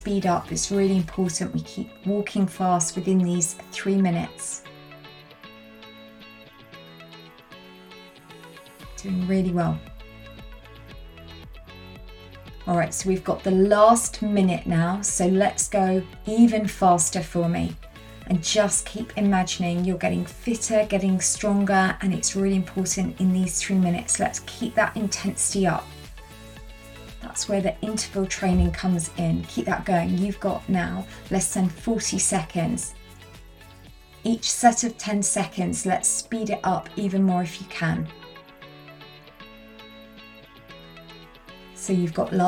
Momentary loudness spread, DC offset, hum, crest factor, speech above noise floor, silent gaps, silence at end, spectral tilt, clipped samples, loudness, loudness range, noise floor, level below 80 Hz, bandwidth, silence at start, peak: 23 LU; under 0.1%; none; 22 dB; 24 dB; none; 0 s; -4.5 dB/octave; under 0.1%; -23 LUFS; 13 LU; -47 dBFS; -44 dBFS; 16.5 kHz; 0 s; -2 dBFS